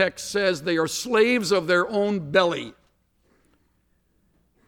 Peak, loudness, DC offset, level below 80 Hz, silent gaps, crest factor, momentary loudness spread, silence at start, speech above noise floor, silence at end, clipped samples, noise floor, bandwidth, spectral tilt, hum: -6 dBFS; -22 LUFS; under 0.1%; -62 dBFS; none; 18 dB; 5 LU; 0 s; 45 dB; 1.95 s; under 0.1%; -67 dBFS; 17.5 kHz; -4 dB/octave; none